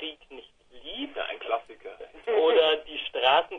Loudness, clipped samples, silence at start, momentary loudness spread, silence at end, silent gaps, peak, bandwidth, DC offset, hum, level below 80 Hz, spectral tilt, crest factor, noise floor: -26 LUFS; under 0.1%; 0 s; 22 LU; 0 s; none; -8 dBFS; 6.2 kHz; under 0.1%; none; -62 dBFS; -3.5 dB/octave; 18 dB; -49 dBFS